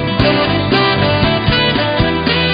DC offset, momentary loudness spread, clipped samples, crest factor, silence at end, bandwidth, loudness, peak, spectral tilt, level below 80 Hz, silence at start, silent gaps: under 0.1%; 1 LU; under 0.1%; 14 dB; 0 s; 5.2 kHz; -13 LUFS; 0 dBFS; -8.5 dB/octave; -28 dBFS; 0 s; none